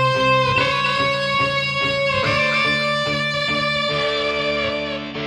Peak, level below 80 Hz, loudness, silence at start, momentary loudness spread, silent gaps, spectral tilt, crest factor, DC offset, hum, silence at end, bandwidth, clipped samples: -6 dBFS; -46 dBFS; -18 LUFS; 0 s; 4 LU; none; -4.5 dB/octave; 14 dB; under 0.1%; none; 0 s; 12.5 kHz; under 0.1%